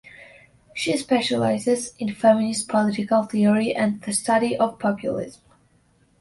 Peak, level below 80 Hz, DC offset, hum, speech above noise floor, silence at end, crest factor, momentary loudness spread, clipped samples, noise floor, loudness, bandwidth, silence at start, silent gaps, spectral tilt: -4 dBFS; -62 dBFS; under 0.1%; none; 39 dB; 0.85 s; 18 dB; 9 LU; under 0.1%; -61 dBFS; -22 LUFS; 11.5 kHz; 0.05 s; none; -4.5 dB/octave